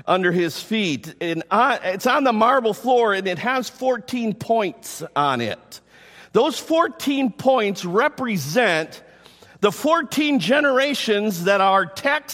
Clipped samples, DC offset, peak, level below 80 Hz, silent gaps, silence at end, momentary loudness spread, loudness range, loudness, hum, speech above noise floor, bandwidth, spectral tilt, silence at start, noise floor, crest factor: under 0.1%; under 0.1%; -4 dBFS; -66 dBFS; none; 0 s; 8 LU; 3 LU; -20 LUFS; none; 28 dB; 16.5 kHz; -4.5 dB/octave; 0.05 s; -48 dBFS; 16 dB